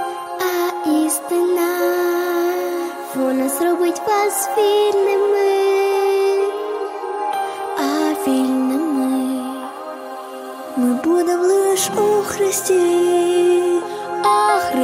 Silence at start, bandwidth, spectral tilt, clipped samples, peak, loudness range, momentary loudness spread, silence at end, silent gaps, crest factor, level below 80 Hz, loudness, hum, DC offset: 0 s; 16 kHz; -3 dB/octave; under 0.1%; -4 dBFS; 4 LU; 10 LU; 0 s; none; 12 dB; -64 dBFS; -18 LUFS; none; under 0.1%